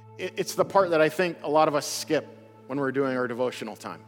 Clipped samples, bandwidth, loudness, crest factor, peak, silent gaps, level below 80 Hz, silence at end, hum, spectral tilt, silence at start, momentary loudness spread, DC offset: under 0.1%; 18.5 kHz; -26 LUFS; 18 dB; -8 dBFS; none; -78 dBFS; 0.05 s; none; -4.5 dB/octave; 0 s; 11 LU; under 0.1%